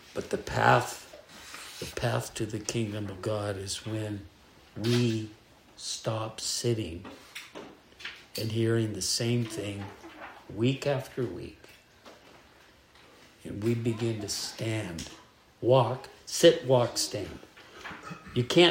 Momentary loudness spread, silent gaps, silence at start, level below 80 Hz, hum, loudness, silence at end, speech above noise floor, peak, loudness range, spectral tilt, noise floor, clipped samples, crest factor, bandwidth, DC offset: 19 LU; none; 0.05 s; -60 dBFS; none; -29 LUFS; 0 s; 29 dB; -6 dBFS; 8 LU; -4.5 dB/octave; -58 dBFS; under 0.1%; 24 dB; 16 kHz; under 0.1%